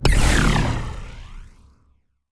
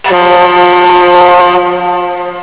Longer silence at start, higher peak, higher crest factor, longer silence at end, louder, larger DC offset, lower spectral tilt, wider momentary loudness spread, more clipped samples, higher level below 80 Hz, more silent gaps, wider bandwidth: about the same, 0 s vs 0.05 s; about the same, -2 dBFS vs 0 dBFS; first, 18 dB vs 6 dB; first, 0.85 s vs 0 s; second, -20 LUFS vs -6 LUFS; neither; second, -4.5 dB/octave vs -8 dB/octave; first, 22 LU vs 8 LU; second, under 0.1% vs 3%; first, -24 dBFS vs -42 dBFS; neither; first, 11 kHz vs 4 kHz